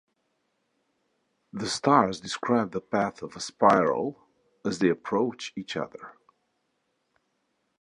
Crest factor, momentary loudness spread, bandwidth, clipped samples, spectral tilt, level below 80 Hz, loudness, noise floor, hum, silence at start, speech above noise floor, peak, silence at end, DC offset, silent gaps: 24 dB; 15 LU; 11 kHz; under 0.1%; -5 dB/octave; -66 dBFS; -26 LUFS; -76 dBFS; none; 1.55 s; 50 dB; -6 dBFS; 1.7 s; under 0.1%; none